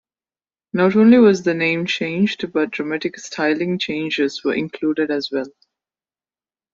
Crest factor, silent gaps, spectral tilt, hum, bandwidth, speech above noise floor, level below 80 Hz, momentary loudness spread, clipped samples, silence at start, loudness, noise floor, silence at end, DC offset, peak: 16 dB; none; -6 dB/octave; none; 7.6 kHz; over 72 dB; -62 dBFS; 13 LU; under 0.1%; 0.75 s; -18 LUFS; under -90 dBFS; 1.25 s; under 0.1%; -2 dBFS